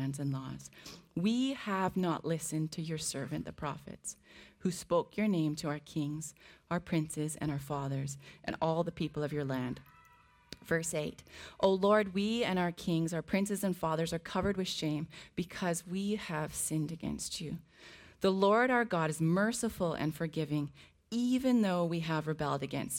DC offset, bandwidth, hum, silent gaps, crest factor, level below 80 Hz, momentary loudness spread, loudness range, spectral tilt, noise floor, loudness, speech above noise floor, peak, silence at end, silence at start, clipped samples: under 0.1%; 17 kHz; none; none; 20 dB; -62 dBFS; 13 LU; 5 LU; -5 dB/octave; -63 dBFS; -34 LUFS; 30 dB; -14 dBFS; 0 s; 0 s; under 0.1%